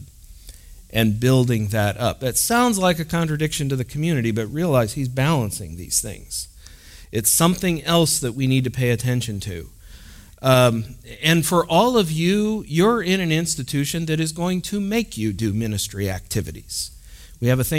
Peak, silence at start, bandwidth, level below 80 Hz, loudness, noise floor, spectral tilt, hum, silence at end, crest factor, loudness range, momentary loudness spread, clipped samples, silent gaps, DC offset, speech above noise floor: -2 dBFS; 0 s; 16.5 kHz; -44 dBFS; -21 LUFS; -43 dBFS; -4.5 dB/octave; none; 0 s; 18 dB; 4 LU; 11 LU; under 0.1%; none; under 0.1%; 23 dB